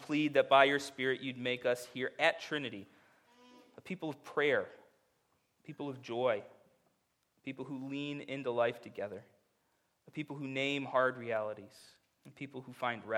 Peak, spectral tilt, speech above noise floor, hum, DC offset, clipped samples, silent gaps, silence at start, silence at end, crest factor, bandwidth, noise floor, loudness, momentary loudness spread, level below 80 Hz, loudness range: -10 dBFS; -5 dB/octave; 43 dB; none; under 0.1%; under 0.1%; none; 0 s; 0 s; 26 dB; 16 kHz; -78 dBFS; -35 LUFS; 17 LU; -86 dBFS; 8 LU